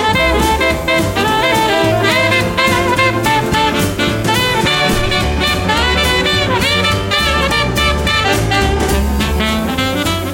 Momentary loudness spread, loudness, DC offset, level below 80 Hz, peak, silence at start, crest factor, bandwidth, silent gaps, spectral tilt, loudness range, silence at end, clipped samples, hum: 3 LU; -13 LUFS; under 0.1%; -24 dBFS; -2 dBFS; 0 s; 12 dB; 17 kHz; none; -4 dB/octave; 1 LU; 0 s; under 0.1%; none